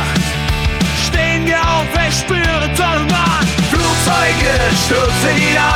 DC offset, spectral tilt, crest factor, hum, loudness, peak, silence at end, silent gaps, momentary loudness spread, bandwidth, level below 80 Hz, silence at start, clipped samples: under 0.1%; -4 dB/octave; 12 dB; none; -13 LUFS; 0 dBFS; 0 s; none; 3 LU; 20 kHz; -24 dBFS; 0 s; under 0.1%